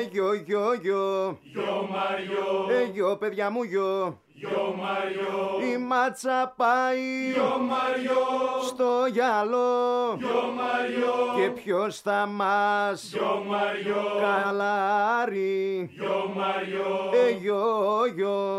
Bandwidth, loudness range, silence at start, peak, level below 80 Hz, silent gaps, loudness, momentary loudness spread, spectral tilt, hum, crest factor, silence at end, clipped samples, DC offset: 13.5 kHz; 3 LU; 0 s; -12 dBFS; -76 dBFS; none; -26 LUFS; 5 LU; -5 dB/octave; none; 14 dB; 0 s; under 0.1%; under 0.1%